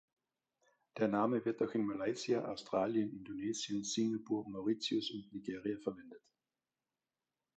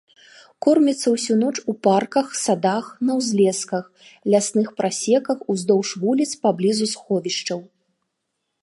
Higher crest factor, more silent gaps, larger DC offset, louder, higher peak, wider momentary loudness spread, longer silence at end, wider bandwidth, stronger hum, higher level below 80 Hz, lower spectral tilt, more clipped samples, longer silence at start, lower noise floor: about the same, 20 dB vs 18 dB; neither; neither; second, -38 LUFS vs -21 LUFS; second, -20 dBFS vs -4 dBFS; first, 9 LU vs 6 LU; first, 1.4 s vs 1 s; second, 8.8 kHz vs 11.5 kHz; neither; second, -78 dBFS vs -72 dBFS; about the same, -4.5 dB/octave vs -4.5 dB/octave; neither; first, 0.95 s vs 0.6 s; first, under -90 dBFS vs -77 dBFS